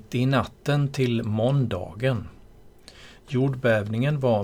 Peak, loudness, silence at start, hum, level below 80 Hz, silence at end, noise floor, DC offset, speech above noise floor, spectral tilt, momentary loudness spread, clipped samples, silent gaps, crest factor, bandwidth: -8 dBFS; -25 LUFS; 0.1 s; none; -52 dBFS; 0 s; -49 dBFS; under 0.1%; 26 dB; -7.5 dB/octave; 5 LU; under 0.1%; none; 16 dB; 13.5 kHz